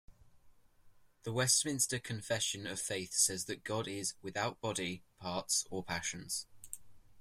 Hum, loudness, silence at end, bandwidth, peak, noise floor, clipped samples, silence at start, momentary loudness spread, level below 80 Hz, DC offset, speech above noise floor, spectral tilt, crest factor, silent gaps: none; -35 LUFS; 0 s; 16 kHz; -16 dBFS; -63 dBFS; under 0.1%; 0.1 s; 13 LU; -68 dBFS; under 0.1%; 26 dB; -2 dB/octave; 22 dB; none